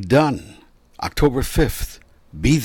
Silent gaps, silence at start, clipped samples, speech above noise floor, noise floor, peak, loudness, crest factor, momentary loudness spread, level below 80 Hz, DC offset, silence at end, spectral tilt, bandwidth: none; 0 s; under 0.1%; 30 dB; -48 dBFS; -6 dBFS; -21 LUFS; 14 dB; 14 LU; -30 dBFS; under 0.1%; 0 s; -6 dB/octave; 17 kHz